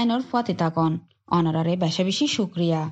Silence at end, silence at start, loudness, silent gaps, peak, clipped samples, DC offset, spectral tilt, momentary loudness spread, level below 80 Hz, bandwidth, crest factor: 0 s; 0 s; -24 LUFS; none; -8 dBFS; under 0.1%; under 0.1%; -6 dB/octave; 3 LU; -64 dBFS; 8.2 kHz; 14 dB